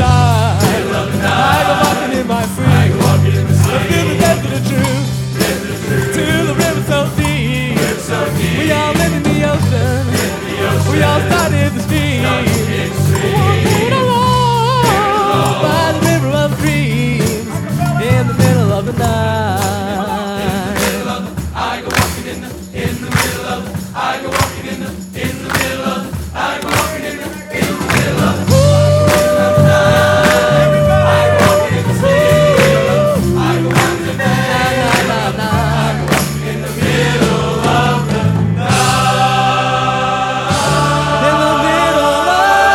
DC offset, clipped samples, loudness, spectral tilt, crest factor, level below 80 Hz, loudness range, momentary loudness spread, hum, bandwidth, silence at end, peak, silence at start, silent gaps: under 0.1%; under 0.1%; -13 LUFS; -5 dB/octave; 12 dB; -32 dBFS; 7 LU; 8 LU; none; 17 kHz; 0 s; 0 dBFS; 0 s; none